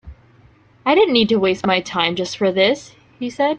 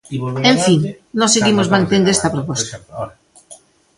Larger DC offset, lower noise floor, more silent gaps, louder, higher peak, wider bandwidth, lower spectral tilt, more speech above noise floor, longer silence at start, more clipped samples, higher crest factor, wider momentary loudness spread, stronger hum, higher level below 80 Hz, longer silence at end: neither; first, -51 dBFS vs -44 dBFS; neither; about the same, -17 LUFS vs -15 LUFS; about the same, -2 dBFS vs 0 dBFS; second, 9 kHz vs 11.5 kHz; about the same, -4.5 dB/octave vs -4 dB/octave; first, 33 dB vs 29 dB; about the same, 0.05 s vs 0.1 s; neither; about the same, 18 dB vs 16 dB; second, 11 LU vs 16 LU; neither; about the same, -50 dBFS vs -50 dBFS; second, 0 s vs 0.45 s